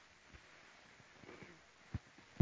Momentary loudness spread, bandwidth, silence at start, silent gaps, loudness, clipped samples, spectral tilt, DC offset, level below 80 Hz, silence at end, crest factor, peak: 10 LU; 8 kHz; 0 s; none; -56 LUFS; under 0.1%; -5.5 dB/octave; under 0.1%; -64 dBFS; 0 s; 28 dB; -18 dBFS